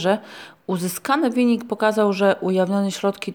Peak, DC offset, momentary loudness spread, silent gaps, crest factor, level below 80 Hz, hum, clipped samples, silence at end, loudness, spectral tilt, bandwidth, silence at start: -4 dBFS; under 0.1%; 8 LU; none; 16 dB; -72 dBFS; none; under 0.1%; 0 s; -21 LUFS; -5.5 dB/octave; over 20 kHz; 0 s